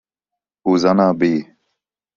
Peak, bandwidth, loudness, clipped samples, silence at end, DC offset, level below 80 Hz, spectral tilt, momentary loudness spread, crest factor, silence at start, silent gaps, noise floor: -2 dBFS; 7.2 kHz; -17 LUFS; under 0.1%; 0.75 s; under 0.1%; -58 dBFS; -7 dB/octave; 10 LU; 16 dB; 0.65 s; none; -84 dBFS